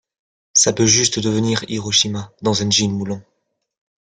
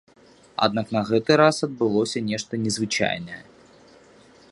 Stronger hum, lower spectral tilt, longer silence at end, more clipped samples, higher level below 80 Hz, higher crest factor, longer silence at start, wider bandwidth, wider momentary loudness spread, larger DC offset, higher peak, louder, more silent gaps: neither; second, -3 dB/octave vs -4.5 dB/octave; second, 0.95 s vs 1.1 s; neither; first, -54 dBFS vs -62 dBFS; about the same, 20 dB vs 22 dB; about the same, 0.55 s vs 0.6 s; about the same, 11 kHz vs 11.5 kHz; second, 10 LU vs 13 LU; neither; about the same, 0 dBFS vs -2 dBFS; first, -16 LUFS vs -22 LUFS; neither